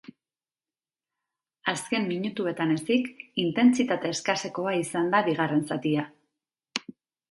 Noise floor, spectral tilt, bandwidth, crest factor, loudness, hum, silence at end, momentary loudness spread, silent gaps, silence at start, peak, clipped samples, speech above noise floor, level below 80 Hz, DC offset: under -90 dBFS; -5 dB/octave; 11.5 kHz; 22 dB; -27 LUFS; none; 0.4 s; 10 LU; none; 1.65 s; -6 dBFS; under 0.1%; over 64 dB; -74 dBFS; under 0.1%